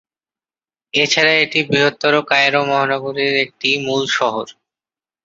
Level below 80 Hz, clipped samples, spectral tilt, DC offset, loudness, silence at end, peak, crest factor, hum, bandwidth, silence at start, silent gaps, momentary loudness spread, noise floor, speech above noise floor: -62 dBFS; under 0.1%; -3.5 dB/octave; under 0.1%; -15 LUFS; 0.75 s; -2 dBFS; 16 dB; none; 7.8 kHz; 0.95 s; none; 7 LU; under -90 dBFS; over 74 dB